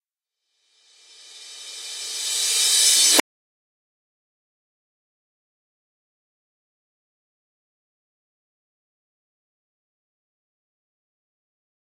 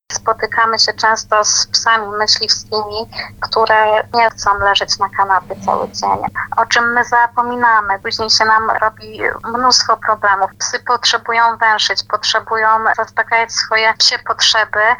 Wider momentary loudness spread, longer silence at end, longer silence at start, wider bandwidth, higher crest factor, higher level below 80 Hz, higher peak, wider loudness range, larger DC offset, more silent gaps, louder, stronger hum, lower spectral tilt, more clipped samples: first, 22 LU vs 7 LU; first, 8.8 s vs 0 s; first, 1.35 s vs 0.1 s; second, 16.5 kHz vs 19.5 kHz; first, 28 dB vs 14 dB; second, -80 dBFS vs -46 dBFS; about the same, 0 dBFS vs 0 dBFS; about the same, 2 LU vs 1 LU; neither; neither; second, -16 LUFS vs -13 LUFS; second, none vs 50 Hz at -50 dBFS; second, 3 dB/octave vs -0.5 dB/octave; neither